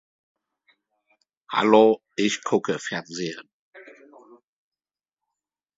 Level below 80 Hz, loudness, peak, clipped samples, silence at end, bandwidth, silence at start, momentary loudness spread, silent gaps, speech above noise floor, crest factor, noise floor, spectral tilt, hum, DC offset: -76 dBFS; -22 LUFS; -2 dBFS; under 0.1%; 1.95 s; 7.8 kHz; 1.5 s; 15 LU; 3.53-3.73 s; over 68 dB; 24 dB; under -90 dBFS; -4.5 dB/octave; none; under 0.1%